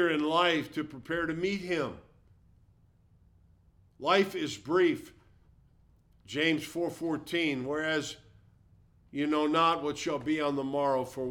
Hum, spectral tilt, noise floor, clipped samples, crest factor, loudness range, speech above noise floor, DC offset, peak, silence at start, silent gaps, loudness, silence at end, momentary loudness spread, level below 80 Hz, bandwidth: none; -4.5 dB/octave; -63 dBFS; under 0.1%; 20 dB; 3 LU; 34 dB; under 0.1%; -12 dBFS; 0 s; none; -30 LUFS; 0 s; 12 LU; -64 dBFS; 17 kHz